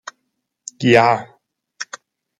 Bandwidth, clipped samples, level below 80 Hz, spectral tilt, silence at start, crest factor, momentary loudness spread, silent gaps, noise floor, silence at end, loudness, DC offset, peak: 11.5 kHz; under 0.1%; -62 dBFS; -5 dB/octave; 0.8 s; 18 dB; 24 LU; none; -74 dBFS; 0.55 s; -15 LUFS; under 0.1%; -2 dBFS